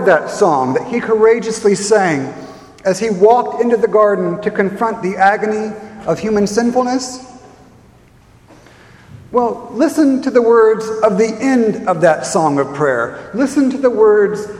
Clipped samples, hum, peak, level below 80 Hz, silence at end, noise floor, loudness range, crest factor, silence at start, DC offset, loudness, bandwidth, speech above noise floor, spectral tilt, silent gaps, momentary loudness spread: under 0.1%; none; 0 dBFS; -52 dBFS; 0 s; -46 dBFS; 7 LU; 14 dB; 0 s; under 0.1%; -14 LUFS; 12.5 kHz; 32 dB; -5.5 dB/octave; none; 9 LU